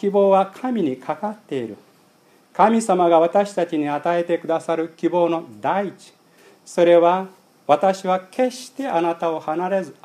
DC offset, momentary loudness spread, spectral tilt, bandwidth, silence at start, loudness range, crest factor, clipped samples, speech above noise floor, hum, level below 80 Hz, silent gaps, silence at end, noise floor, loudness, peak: under 0.1%; 13 LU; -6 dB/octave; 13.5 kHz; 0 s; 2 LU; 20 dB; under 0.1%; 36 dB; none; -80 dBFS; none; 0.1 s; -55 dBFS; -20 LUFS; 0 dBFS